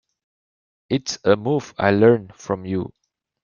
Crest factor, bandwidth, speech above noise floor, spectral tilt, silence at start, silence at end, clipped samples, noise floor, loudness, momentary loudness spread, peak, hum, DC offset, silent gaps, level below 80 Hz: 20 dB; 7.2 kHz; over 71 dB; -6 dB/octave; 0.9 s; 0.55 s; under 0.1%; under -90 dBFS; -20 LUFS; 12 LU; -2 dBFS; none; under 0.1%; none; -60 dBFS